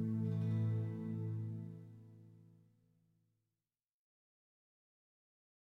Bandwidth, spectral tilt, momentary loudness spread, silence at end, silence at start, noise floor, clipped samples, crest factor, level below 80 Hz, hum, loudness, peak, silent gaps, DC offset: 3.9 kHz; -10.5 dB/octave; 22 LU; 3.3 s; 0 s; under -90 dBFS; under 0.1%; 14 dB; -80 dBFS; none; -41 LUFS; -28 dBFS; none; under 0.1%